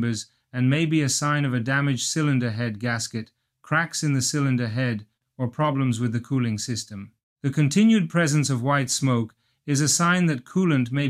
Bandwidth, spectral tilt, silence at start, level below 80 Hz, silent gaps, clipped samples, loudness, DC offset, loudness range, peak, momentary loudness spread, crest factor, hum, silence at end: 15 kHz; -5 dB/octave; 0 s; -64 dBFS; 7.23-7.36 s; under 0.1%; -23 LUFS; under 0.1%; 4 LU; -8 dBFS; 12 LU; 14 dB; none; 0 s